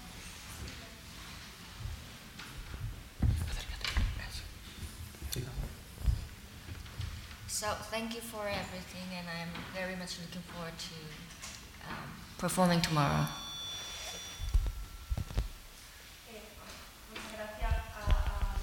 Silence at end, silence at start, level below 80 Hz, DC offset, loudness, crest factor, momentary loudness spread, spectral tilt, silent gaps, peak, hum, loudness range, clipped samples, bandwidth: 0 s; 0 s; -42 dBFS; under 0.1%; -38 LUFS; 24 dB; 14 LU; -4.5 dB/octave; none; -14 dBFS; none; 8 LU; under 0.1%; 17.5 kHz